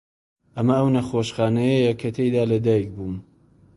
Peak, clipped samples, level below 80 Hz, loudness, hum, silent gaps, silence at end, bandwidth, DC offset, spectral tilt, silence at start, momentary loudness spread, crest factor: -6 dBFS; under 0.1%; -52 dBFS; -21 LUFS; none; none; 0.55 s; 11.5 kHz; under 0.1%; -7.5 dB/octave; 0.55 s; 13 LU; 16 dB